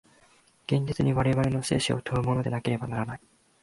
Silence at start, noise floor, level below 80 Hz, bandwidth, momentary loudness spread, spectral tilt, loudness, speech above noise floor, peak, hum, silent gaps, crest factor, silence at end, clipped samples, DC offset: 0.7 s; -61 dBFS; -50 dBFS; 11.5 kHz; 9 LU; -6 dB/octave; -27 LUFS; 35 dB; -12 dBFS; none; none; 16 dB; 0.45 s; under 0.1%; under 0.1%